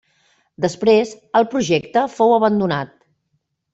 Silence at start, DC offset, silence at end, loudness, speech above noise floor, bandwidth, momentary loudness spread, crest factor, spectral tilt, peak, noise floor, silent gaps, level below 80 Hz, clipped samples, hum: 0.6 s; under 0.1%; 0.85 s; -18 LUFS; 53 dB; 8 kHz; 9 LU; 16 dB; -5.5 dB/octave; -2 dBFS; -70 dBFS; none; -60 dBFS; under 0.1%; none